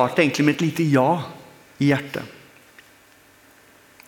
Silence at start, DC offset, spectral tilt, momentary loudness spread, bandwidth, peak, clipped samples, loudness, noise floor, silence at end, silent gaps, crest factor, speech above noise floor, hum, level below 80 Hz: 0 s; under 0.1%; -6 dB/octave; 15 LU; 18 kHz; -2 dBFS; under 0.1%; -21 LUFS; -53 dBFS; 1.75 s; none; 20 dB; 33 dB; none; -64 dBFS